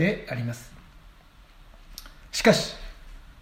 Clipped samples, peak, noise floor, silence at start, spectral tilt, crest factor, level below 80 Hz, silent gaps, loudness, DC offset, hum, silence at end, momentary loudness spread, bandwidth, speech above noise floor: under 0.1%; -4 dBFS; -52 dBFS; 0 s; -4.5 dB/octave; 24 dB; -46 dBFS; none; -25 LUFS; under 0.1%; none; 0 s; 24 LU; 16 kHz; 28 dB